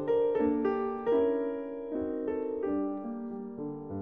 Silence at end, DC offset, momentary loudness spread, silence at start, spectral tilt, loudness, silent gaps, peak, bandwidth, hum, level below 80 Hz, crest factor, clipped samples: 0 s; under 0.1%; 11 LU; 0 s; -9.5 dB/octave; -32 LUFS; none; -16 dBFS; 3.6 kHz; none; -62 dBFS; 14 dB; under 0.1%